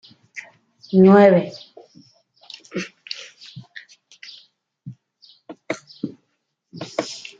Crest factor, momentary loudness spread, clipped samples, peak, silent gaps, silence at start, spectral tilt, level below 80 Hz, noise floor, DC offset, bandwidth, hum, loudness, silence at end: 20 dB; 29 LU; under 0.1%; -2 dBFS; none; 0.35 s; -7 dB/octave; -66 dBFS; -73 dBFS; under 0.1%; 7.6 kHz; none; -18 LUFS; 0.2 s